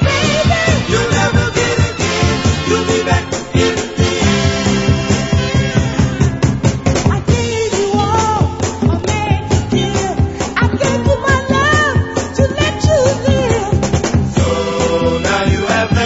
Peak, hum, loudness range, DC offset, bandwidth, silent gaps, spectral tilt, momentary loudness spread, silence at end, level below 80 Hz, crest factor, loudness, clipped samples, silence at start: 0 dBFS; none; 1 LU; under 0.1%; 8 kHz; none; -5 dB/octave; 3 LU; 0 s; -26 dBFS; 14 dB; -14 LUFS; under 0.1%; 0 s